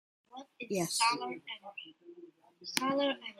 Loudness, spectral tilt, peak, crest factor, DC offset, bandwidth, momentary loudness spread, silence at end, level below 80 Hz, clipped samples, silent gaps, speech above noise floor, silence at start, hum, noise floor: -33 LUFS; -2.5 dB/octave; -8 dBFS; 30 dB; under 0.1%; 15 kHz; 23 LU; 0.05 s; -84 dBFS; under 0.1%; none; 22 dB; 0.35 s; none; -57 dBFS